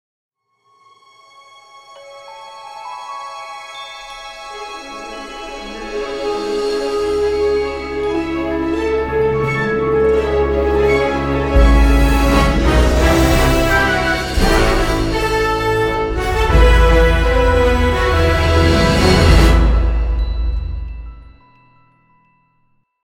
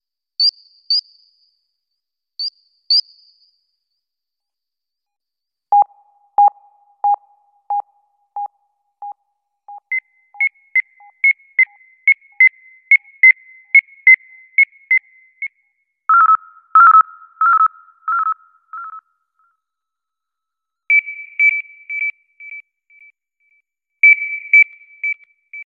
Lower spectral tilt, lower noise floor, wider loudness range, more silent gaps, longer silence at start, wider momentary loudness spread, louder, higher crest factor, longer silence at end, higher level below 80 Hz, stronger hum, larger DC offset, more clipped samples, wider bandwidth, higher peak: first, -6 dB/octave vs 2.5 dB/octave; second, -60 dBFS vs -85 dBFS; first, 17 LU vs 11 LU; neither; first, 1.9 s vs 0.4 s; about the same, 18 LU vs 20 LU; about the same, -15 LUFS vs -14 LUFS; about the same, 16 dB vs 16 dB; first, 1.8 s vs 0 s; first, -18 dBFS vs under -90 dBFS; neither; neither; neither; first, 17 kHz vs 7.2 kHz; about the same, 0 dBFS vs -2 dBFS